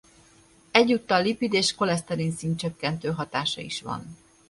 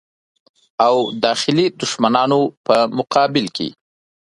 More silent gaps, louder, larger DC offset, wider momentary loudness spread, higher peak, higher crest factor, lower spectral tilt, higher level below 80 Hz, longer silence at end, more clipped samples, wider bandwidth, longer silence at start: second, none vs 2.57-2.64 s; second, -25 LUFS vs -17 LUFS; neither; first, 11 LU vs 8 LU; about the same, -2 dBFS vs 0 dBFS; first, 26 dB vs 18 dB; about the same, -4.5 dB/octave vs -4.5 dB/octave; about the same, -60 dBFS vs -62 dBFS; second, 0.35 s vs 0.65 s; neither; about the same, 11.5 kHz vs 11.5 kHz; about the same, 0.75 s vs 0.8 s